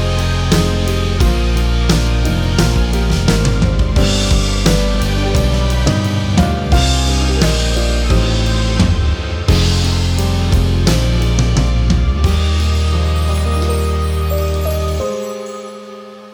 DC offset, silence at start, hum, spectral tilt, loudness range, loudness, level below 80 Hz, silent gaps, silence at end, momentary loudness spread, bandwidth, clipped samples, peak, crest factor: under 0.1%; 0 s; none; -5.5 dB/octave; 2 LU; -15 LUFS; -18 dBFS; none; 0 s; 4 LU; 19 kHz; under 0.1%; 0 dBFS; 12 dB